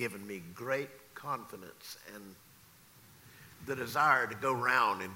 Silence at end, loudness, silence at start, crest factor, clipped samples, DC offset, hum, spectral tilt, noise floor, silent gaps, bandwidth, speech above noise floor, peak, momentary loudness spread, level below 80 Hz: 0 s; -32 LUFS; 0 s; 22 dB; under 0.1%; under 0.1%; none; -4 dB/octave; -60 dBFS; none; 16 kHz; 26 dB; -14 dBFS; 22 LU; -74 dBFS